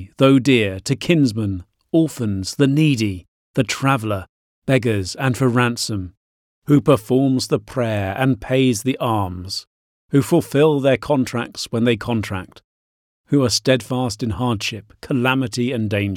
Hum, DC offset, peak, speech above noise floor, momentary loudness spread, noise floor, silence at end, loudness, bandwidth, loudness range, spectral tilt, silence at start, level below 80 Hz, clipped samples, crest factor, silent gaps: none; under 0.1%; -4 dBFS; over 72 dB; 10 LU; under -90 dBFS; 0 s; -19 LUFS; 16.5 kHz; 2 LU; -5.5 dB/octave; 0 s; -50 dBFS; under 0.1%; 16 dB; 3.28-3.54 s, 4.29-4.62 s, 6.17-6.62 s, 9.67-10.09 s, 12.64-13.24 s